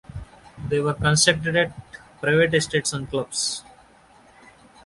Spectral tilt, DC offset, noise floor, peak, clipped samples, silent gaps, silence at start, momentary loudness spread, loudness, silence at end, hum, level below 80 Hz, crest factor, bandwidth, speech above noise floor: -3.5 dB/octave; under 0.1%; -53 dBFS; -2 dBFS; under 0.1%; none; 0.15 s; 18 LU; -21 LUFS; 1.25 s; none; -48 dBFS; 22 dB; 11.5 kHz; 31 dB